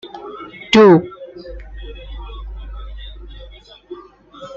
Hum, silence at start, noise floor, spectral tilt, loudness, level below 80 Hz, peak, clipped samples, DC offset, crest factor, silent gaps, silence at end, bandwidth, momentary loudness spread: none; 0.25 s; -40 dBFS; -6.5 dB/octave; -11 LUFS; -34 dBFS; 0 dBFS; under 0.1%; under 0.1%; 18 dB; none; 0.1 s; 7.6 kHz; 27 LU